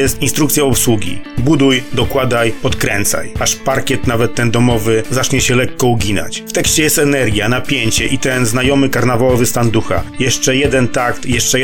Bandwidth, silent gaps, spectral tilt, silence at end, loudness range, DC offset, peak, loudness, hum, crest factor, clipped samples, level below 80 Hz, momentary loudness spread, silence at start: 18 kHz; none; -4 dB/octave; 0 s; 2 LU; 8%; 0 dBFS; -13 LUFS; none; 14 dB; under 0.1%; -32 dBFS; 5 LU; 0 s